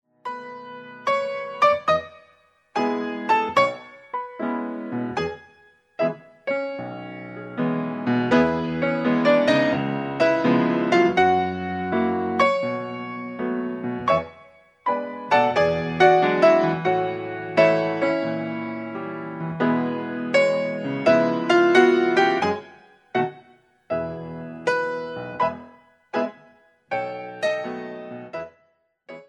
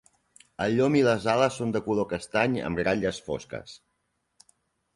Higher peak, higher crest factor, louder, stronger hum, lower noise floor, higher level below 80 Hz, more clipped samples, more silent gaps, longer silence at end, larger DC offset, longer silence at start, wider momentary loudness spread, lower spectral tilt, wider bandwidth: first, -2 dBFS vs -8 dBFS; about the same, 20 dB vs 20 dB; first, -22 LUFS vs -26 LUFS; neither; second, -65 dBFS vs -76 dBFS; about the same, -60 dBFS vs -56 dBFS; neither; neither; second, 0.05 s vs 1.2 s; neither; second, 0.25 s vs 0.6 s; about the same, 16 LU vs 15 LU; about the same, -6.5 dB/octave vs -6 dB/octave; second, 9.8 kHz vs 11.5 kHz